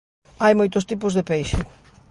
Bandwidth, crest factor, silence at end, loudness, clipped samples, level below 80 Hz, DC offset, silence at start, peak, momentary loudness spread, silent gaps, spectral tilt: 11.5 kHz; 18 dB; 0.45 s; -21 LUFS; under 0.1%; -38 dBFS; under 0.1%; 0.4 s; -4 dBFS; 10 LU; none; -6 dB/octave